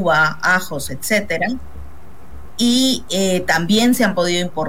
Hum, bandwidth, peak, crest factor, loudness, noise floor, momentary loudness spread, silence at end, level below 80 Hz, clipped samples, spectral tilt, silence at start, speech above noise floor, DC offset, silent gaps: none; 16.5 kHz; -4 dBFS; 12 dB; -17 LUFS; -40 dBFS; 9 LU; 0 s; -44 dBFS; under 0.1%; -3.5 dB/octave; 0 s; 23 dB; 4%; none